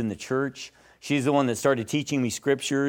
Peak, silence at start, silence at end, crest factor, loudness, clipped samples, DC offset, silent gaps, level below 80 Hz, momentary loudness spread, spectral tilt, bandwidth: -8 dBFS; 0 s; 0 s; 18 dB; -26 LUFS; under 0.1%; under 0.1%; none; -66 dBFS; 14 LU; -5 dB/octave; 17 kHz